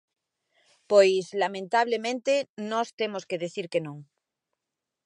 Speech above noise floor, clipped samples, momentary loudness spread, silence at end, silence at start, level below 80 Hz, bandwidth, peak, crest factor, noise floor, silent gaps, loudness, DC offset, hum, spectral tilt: 61 dB; under 0.1%; 12 LU; 1.05 s; 0.9 s; -84 dBFS; 11 kHz; -8 dBFS; 20 dB; -87 dBFS; 2.49-2.57 s, 2.93-2.98 s; -26 LUFS; under 0.1%; none; -4 dB/octave